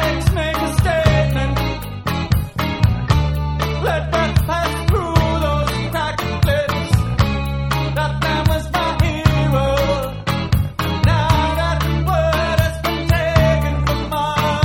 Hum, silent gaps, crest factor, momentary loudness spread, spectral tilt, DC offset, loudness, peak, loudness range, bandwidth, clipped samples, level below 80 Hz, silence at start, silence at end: none; none; 16 dB; 5 LU; -6 dB/octave; under 0.1%; -18 LUFS; 0 dBFS; 2 LU; 17.5 kHz; under 0.1%; -24 dBFS; 0 s; 0 s